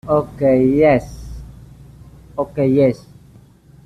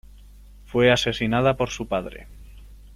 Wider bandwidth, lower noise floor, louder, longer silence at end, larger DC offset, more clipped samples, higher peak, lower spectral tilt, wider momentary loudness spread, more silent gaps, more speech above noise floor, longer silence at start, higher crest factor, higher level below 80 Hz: second, 12 kHz vs 14.5 kHz; about the same, -46 dBFS vs -46 dBFS; first, -16 LUFS vs -22 LUFS; first, 0.9 s vs 0 s; neither; neither; first, -2 dBFS vs -6 dBFS; first, -8.5 dB/octave vs -5 dB/octave; first, 22 LU vs 13 LU; neither; first, 31 dB vs 24 dB; second, 0.05 s vs 0.7 s; about the same, 16 dB vs 20 dB; about the same, -40 dBFS vs -44 dBFS